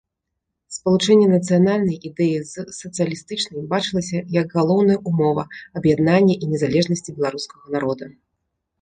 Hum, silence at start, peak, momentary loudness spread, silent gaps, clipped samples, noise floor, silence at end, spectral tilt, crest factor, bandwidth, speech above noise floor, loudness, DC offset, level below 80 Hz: none; 0.7 s; -2 dBFS; 13 LU; none; under 0.1%; -79 dBFS; 0.7 s; -6 dB/octave; 16 dB; 9.6 kHz; 60 dB; -19 LUFS; under 0.1%; -56 dBFS